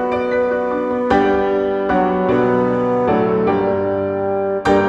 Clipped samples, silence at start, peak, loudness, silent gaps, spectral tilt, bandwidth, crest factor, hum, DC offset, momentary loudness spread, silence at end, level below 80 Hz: under 0.1%; 0 s; 0 dBFS; -17 LUFS; none; -7.5 dB/octave; 8 kHz; 16 dB; none; under 0.1%; 4 LU; 0 s; -44 dBFS